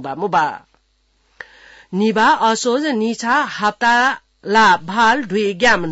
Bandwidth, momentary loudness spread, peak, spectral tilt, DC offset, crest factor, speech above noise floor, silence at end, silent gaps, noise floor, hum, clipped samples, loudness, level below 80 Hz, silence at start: 8 kHz; 6 LU; -4 dBFS; -3.5 dB/octave; under 0.1%; 14 dB; 45 dB; 0 s; none; -61 dBFS; none; under 0.1%; -16 LUFS; -52 dBFS; 0 s